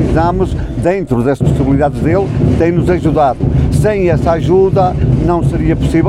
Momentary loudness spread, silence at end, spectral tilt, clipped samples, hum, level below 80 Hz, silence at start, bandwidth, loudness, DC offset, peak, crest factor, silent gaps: 3 LU; 0 s; -8.5 dB/octave; under 0.1%; none; -22 dBFS; 0 s; 12 kHz; -12 LUFS; under 0.1%; 0 dBFS; 10 dB; none